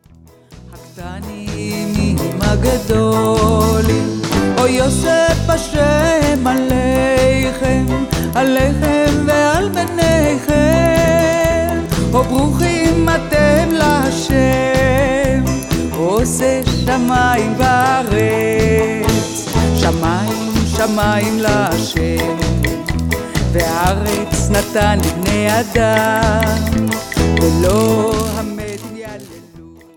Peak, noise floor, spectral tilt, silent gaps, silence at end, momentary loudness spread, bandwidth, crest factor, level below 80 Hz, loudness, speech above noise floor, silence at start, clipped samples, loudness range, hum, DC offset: 0 dBFS; -44 dBFS; -5.5 dB/octave; none; 0.25 s; 5 LU; 18.5 kHz; 14 dB; -26 dBFS; -14 LUFS; 30 dB; 0.5 s; under 0.1%; 3 LU; none; 0.4%